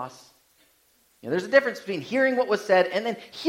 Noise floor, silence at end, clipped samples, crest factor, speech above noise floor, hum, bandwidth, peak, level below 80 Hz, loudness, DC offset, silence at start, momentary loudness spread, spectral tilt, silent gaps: -64 dBFS; 0 s; under 0.1%; 20 dB; 39 dB; none; 14.5 kHz; -6 dBFS; -74 dBFS; -24 LUFS; under 0.1%; 0 s; 11 LU; -4.5 dB/octave; none